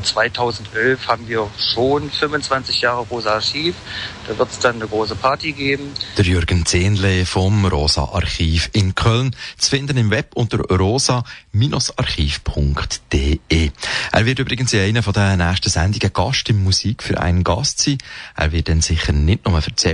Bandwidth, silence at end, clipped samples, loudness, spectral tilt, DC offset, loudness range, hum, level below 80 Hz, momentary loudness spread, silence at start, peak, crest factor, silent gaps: 11 kHz; 0 s; under 0.1%; -18 LUFS; -4.5 dB/octave; under 0.1%; 2 LU; none; -30 dBFS; 5 LU; 0 s; -2 dBFS; 14 dB; none